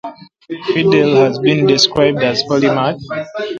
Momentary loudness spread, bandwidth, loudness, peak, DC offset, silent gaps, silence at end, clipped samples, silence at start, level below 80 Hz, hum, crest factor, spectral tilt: 13 LU; 7.8 kHz; -13 LUFS; 0 dBFS; under 0.1%; none; 0 s; under 0.1%; 0.05 s; -52 dBFS; none; 14 dB; -5 dB/octave